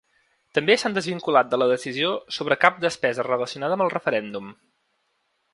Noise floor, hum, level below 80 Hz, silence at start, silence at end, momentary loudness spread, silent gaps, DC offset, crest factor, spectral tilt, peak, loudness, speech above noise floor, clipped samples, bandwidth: -72 dBFS; none; -70 dBFS; 0.55 s; 1 s; 8 LU; none; under 0.1%; 24 dB; -4 dB/octave; 0 dBFS; -22 LUFS; 49 dB; under 0.1%; 11.5 kHz